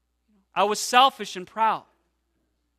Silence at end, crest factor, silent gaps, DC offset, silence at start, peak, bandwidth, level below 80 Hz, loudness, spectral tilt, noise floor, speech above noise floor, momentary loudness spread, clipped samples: 1 s; 22 dB; none; under 0.1%; 0.55 s; -4 dBFS; 14 kHz; -72 dBFS; -22 LUFS; -1.5 dB/octave; -73 dBFS; 50 dB; 15 LU; under 0.1%